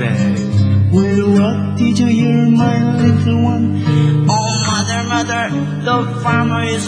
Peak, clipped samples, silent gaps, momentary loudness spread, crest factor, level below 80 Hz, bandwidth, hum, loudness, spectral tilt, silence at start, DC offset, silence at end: 0 dBFS; under 0.1%; none; 4 LU; 12 dB; -48 dBFS; 10 kHz; none; -14 LUFS; -6 dB/octave; 0 s; under 0.1%; 0 s